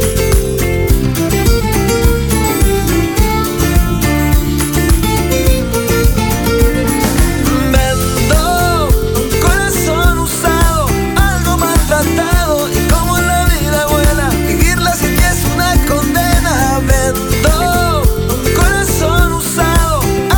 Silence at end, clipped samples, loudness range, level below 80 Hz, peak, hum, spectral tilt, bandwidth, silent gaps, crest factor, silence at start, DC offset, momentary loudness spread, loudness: 0 s; under 0.1%; 1 LU; -16 dBFS; 0 dBFS; none; -4.5 dB/octave; over 20 kHz; none; 12 dB; 0 s; under 0.1%; 2 LU; -12 LUFS